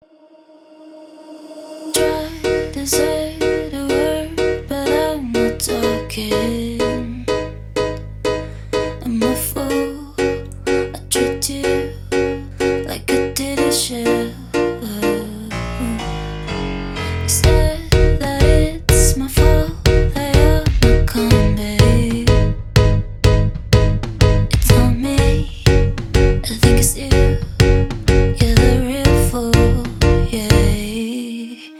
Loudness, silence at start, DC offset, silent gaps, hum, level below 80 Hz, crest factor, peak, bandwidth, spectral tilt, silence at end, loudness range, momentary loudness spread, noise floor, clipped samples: -17 LUFS; 0.8 s; under 0.1%; none; none; -22 dBFS; 16 dB; 0 dBFS; 17 kHz; -5 dB/octave; 0 s; 6 LU; 9 LU; -47 dBFS; under 0.1%